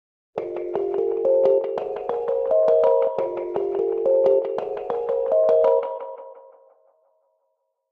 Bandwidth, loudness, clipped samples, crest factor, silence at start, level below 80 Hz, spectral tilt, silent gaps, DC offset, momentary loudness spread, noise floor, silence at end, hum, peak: 4.8 kHz; -22 LUFS; under 0.1%; 16 dB; 0.35 s; -64 dBFS; -7.5 dB/octave; none; under 0.1%; 13 LU; -74 dBFS; 1.5 s; none; -8 dBFS